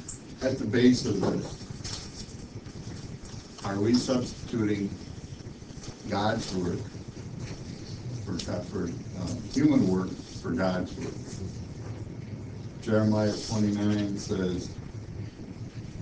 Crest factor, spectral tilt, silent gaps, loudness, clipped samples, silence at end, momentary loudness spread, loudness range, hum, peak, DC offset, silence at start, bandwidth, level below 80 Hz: 22 dB; -6 dB/octave; none; -30 LUFS; under 0.1%; 0 s; 17 LU; 4 LU; none; -8 dBFS; under 0.1%; 0 s; 8 kHz; -48 dBFS